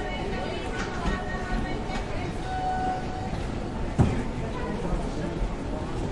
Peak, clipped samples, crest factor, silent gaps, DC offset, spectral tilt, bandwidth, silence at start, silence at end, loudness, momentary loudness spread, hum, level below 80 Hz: -8 dBFS; under 0.1%; 20 dB; none; under 0.1%; -6.5 dB/octave; 11.5 kHz; 0 s; 0 s; -30 LUFS; 7 LU; none; -34 dBFS